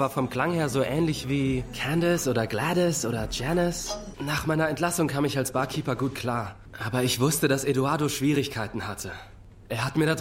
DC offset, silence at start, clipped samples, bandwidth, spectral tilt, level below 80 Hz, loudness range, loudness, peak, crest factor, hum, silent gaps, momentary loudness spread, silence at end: under 0.1%; 0 s; under 0.1%; 16 kHz; -5 dB/octave; -46 dBFS; 1 LU; -26 LUFS; -8 dBFS; 18 dB; none; none; 9 LU; 0 s